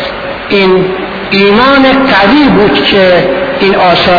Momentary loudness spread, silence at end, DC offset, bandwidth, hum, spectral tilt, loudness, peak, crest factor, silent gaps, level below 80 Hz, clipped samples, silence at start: 7 LU; 0 s; under 0.1%; 5.4 kHz; none; -7 dB/octave; -6 LUFS; 0 dBFS; 6 dB; none; -32 dBFS; 1%; 0 s